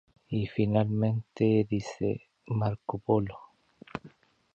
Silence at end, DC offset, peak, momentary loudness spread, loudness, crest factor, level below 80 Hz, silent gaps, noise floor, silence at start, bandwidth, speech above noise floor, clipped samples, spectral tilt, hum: 0.45 s; under 0.1%; -12 dBFS; 17 LU; -30 LUFS; 18 dB; -58 dBFS; none; -56 dBFS; 0.3 s; 7.4 kHz; 28 dB; under 0.1%; -8.5 dB/octave; none